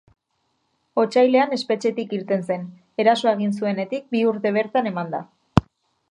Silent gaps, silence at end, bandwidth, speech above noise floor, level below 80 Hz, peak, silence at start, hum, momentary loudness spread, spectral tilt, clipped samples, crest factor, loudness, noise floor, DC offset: none; 0.5 s; 10.5 kHz; 51 dB; -48 dBFS; 0 dBFS; 0.95 s; none; 11 LU; -6.5 dB/octave; under 0.1%; 22 dB; -22 LUFS; -71 dBFS; under 0.1%